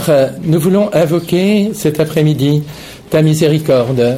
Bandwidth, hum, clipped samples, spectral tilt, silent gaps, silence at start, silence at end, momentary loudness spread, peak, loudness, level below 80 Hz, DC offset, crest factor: 16 kHz; none; under 0.1%; -6.5 dB/octave; none; 0 s; 0 s; 5 LU; -2 dBFS; -13 LUFS; -46 dBFS; under 0.1%; 10 dB